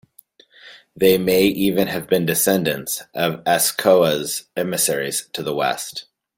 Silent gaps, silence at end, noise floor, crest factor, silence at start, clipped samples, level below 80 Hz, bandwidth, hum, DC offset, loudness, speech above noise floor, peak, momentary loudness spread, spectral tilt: none; 0.35 s; -52 dBFS; 18 dB; 0.65 s; under 0.1%; -56 dBFS; 17 kHz; none; under 0.1%; -19 LUFS; 33 dB; -2 dBFS; 10 LU; -3.5 dB/octave